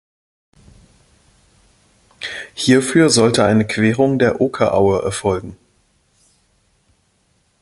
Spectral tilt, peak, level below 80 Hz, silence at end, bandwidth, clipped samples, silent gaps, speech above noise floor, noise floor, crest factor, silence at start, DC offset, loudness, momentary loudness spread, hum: -5 dB/octave; -2 dBFS; -46 dBFS; 2.1 s; 11.5 kHz; under 0.1%; none; 47 dB; -61 dBFS; 18 dB; 2.2 s; under 0.1%; -16 LUFS; 15 LU; none